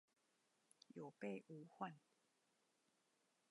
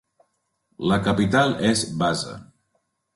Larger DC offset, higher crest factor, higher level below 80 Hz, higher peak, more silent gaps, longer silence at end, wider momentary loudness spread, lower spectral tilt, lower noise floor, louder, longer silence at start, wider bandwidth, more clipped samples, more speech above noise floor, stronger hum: neither; first, 24 dB vs 18 dB; second, under -90 dBFS vs -50 dBFS; second, -34 dBFS vs -6 dBFS; neither; first, 1.5 s vs 0.7 s; about the same, 10 LU vs 10 LU; first, -6.5 dB/octave vs -5 dB/octave; first, -84 dBFS vs -73 dBFS; second, -55 LUFS vs -22 LUFS; first, 0.95 s vs 0.8 s; about the same, 11 kHz vs 11.5 kHz; neither; second, 31 dB vs 52 dB; neither